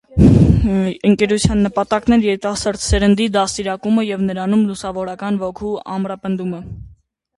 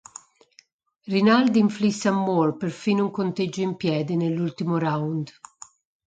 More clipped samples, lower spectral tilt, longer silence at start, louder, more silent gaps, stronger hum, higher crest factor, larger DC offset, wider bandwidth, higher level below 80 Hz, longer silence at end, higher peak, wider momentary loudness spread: neither; about the same, -6 dB/octave vs -6.5 dB/octave; second, 0.1 s vs 1.05 s; first, -17 LUFS vs -23 LUFS; neither; neither; about the same, 16 dB vs 18 dB; neither; first, 11.5 kHz vs 9 kHz; first, -28 dBFS vs -68 dBFS; second, 0.5 s vs 0.75 s; first, 0 dBFS vs -6 dBFS; about the same, 12 LU vs 11 LU